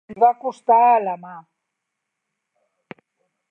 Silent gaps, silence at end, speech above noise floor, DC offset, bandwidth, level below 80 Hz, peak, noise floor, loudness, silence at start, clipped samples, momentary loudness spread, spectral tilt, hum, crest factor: none; 2.1 s; 62 dB; under 0.1%; 6 kHz; -74 dBFS; -4 dBFS; -80 dBFS; -18 LUFS; 0.1 s; under 0.1%; 14 LU; -6.5 dB/octave; none; 18 dB